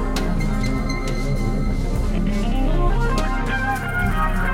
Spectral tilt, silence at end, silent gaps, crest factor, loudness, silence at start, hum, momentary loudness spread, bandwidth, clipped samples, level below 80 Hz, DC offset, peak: -6 dB/octave; 0 s; none; 12 dB; -23 LUFS; 0 s; none; 3 LU; 14 kHz; under 0.1%; -22 dBFS; under 0.1%; -8 dBFS